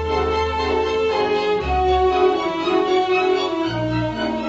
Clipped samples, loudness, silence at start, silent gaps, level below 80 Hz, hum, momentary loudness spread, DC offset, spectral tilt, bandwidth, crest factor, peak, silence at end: under 0.1%; -19 LUFS; 0 s; none; -34 dBFS; 50 Hz at -50 dBFS; 5 LU; under 0.1%; -6 dB/octave; 8 kHz; 12 dB; -6 dBFS; 0 s